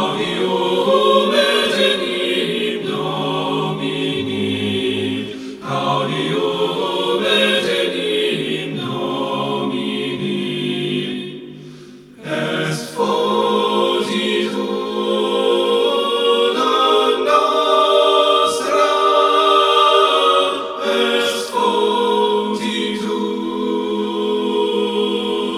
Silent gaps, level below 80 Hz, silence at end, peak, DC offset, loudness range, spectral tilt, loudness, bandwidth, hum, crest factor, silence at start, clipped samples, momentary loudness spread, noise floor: none; -60 dBFS; 0 s; 0 dBFS; under 0.1%; 7 LU; -4.5 dB/octave; -17 LUFS; 15 kHz; none; 16 dB; 0 s; under 0.1%; 9 LU; -39 dBFS